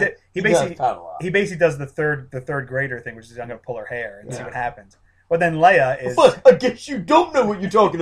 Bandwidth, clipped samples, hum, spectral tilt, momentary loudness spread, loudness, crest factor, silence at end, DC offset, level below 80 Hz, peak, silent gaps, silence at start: 11.5 kHz; under 0.1%; none; -5.5 dB/octave; 17 LU; -19 LUFS; 18 dB; 0 s; under 0.1%; -52 dBFS; 0 dBFS; none; 0 s